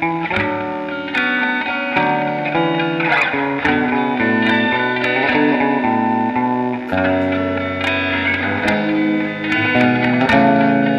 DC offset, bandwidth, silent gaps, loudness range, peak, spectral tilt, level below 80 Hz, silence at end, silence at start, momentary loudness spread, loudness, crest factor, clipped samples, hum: under 0.1%; 9.4 kHz; none; 2 LU; 0 dBFS; -6.5 dB/octave; -50 dBFS; 0 s; 0 s; 5 LU; -16 LUFS; 16 dB; under 0.1%; none